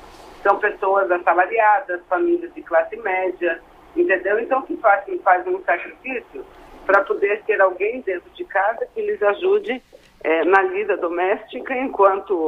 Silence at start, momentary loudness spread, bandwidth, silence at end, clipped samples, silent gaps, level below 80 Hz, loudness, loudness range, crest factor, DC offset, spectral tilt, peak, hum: 0 s; 11 LU; 6.4 kHz; 0 s; under 0.1%; none; -56 dBFS; -20 LUFS; 2 LU; 18 dB; under 0.1%; -5.5 dB/octave; -2 dBFS; none